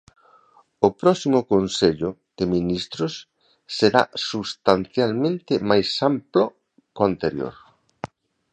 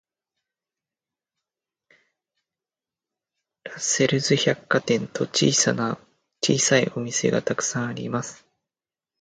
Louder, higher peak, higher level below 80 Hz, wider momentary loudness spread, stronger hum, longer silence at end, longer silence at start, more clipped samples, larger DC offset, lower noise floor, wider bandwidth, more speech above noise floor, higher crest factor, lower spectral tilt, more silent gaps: about the same, -22 LUFS vs -22 LUFS; first, 0 dBFS vs -6 dBFS; first, -54 dBFS vs -64 dBFS; about the same, 13 LU vs 11 LU; neither; second, 0.45 s vs 0.85 s; second, 0.8 s vs 3.65 s; neither; neither; second, -56 dBFS vs under -90 dBFS; about the same, 9.4 kHz vs 10 kHz; second, 35 dB vs over 67 dB; about the same, 22 dB vs 20 dB; first, -5.5 dB/octave vs -3.5 dB/octave; neither